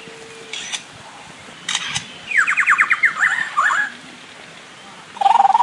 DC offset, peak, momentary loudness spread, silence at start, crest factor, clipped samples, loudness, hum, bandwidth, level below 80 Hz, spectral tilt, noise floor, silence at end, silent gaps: under 0.1%; -2 dBFS; 23 LU; 0 s; 18 dB; under 0.1%; -17 LUFS; none; 11.5 kHz; -66 dBFS; 0 dB/octave; -39 dBFS; 0 s; none